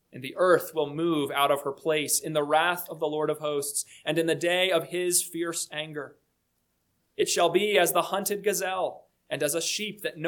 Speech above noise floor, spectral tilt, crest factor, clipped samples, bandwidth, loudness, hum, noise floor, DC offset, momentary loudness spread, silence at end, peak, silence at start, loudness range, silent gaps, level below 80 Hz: 48 dB; -2.5 dB/octave; 20 dB; under 0.1%; 19 kHz; -26 LUFS; none; -75 dBFS; under 0.1%; 10 LU; 0 s; -8 dBFS; 0.15 s; 2 LU; none; -76 dBFS